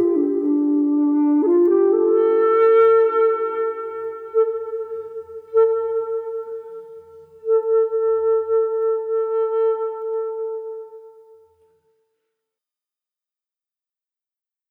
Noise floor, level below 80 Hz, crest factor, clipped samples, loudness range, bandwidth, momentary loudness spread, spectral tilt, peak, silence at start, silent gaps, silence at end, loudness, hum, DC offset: under -90 dBFS; -74 dBFS; 12 dB; under 0.1%; 11 LU; 3.3 kHz; 16 LU; -8 dB/octave; -8 dBFS; 0 s; none; 3.6 s; -19 LUFS; none; under 0.1%